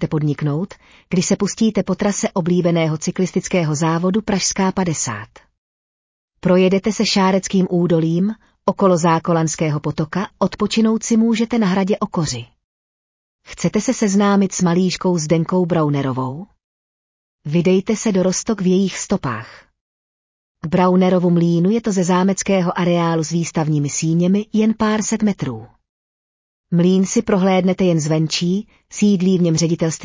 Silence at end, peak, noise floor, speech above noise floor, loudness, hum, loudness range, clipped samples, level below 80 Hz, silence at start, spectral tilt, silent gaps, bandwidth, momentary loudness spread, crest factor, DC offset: 0 s; -4 dBFS; under -90 dBFS; over 73 dB; -17 LUFS; none; 3 LU; under 0.1%; -50 dBFS; 0 s; -5.5 dB/octave; 5.58-6.28 s, 12.64-13.39 s, 16.64-17.39 s, 19.81-20.55 s, 25.89-26.64 s; 7.8 kHz; 7 LU; 14 dB; under 0.1%